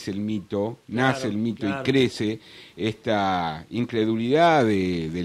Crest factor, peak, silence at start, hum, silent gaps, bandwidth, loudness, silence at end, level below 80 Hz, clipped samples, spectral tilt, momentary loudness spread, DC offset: 16 dB; -6 dBFS; 0 s; none; none; 13.5 kHz; -24 LUFS; 0 s; -56 dBFS; under 0.1%; -6 dB/octave; 11 LU; under 0.1%